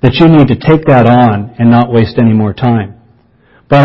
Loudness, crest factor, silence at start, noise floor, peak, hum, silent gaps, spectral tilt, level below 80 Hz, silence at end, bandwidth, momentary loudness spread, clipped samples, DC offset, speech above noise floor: -8 LUFS; 8 dB; 0.05 s; -47 dBFS; 0 dBFS; none; none; -9.5 dB/octave; -34 dBFS; 0 s; 5.8 kHz; 7 LU; 1%; under 0.1%; 39 dB